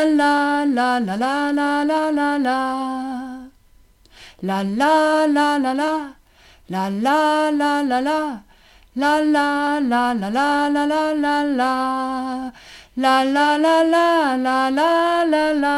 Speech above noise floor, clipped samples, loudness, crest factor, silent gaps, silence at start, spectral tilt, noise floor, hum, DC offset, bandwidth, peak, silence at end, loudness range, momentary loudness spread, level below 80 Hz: 34 dB; under 0.1%; -19 LUFS; 14 dB; none; 0 s; -4.5 dB/octave; -52 dBFS; none; under 0.1%; 13 kHz; -6 dBFS; 0 s; 4 LU; 11 LU; -54 dBFS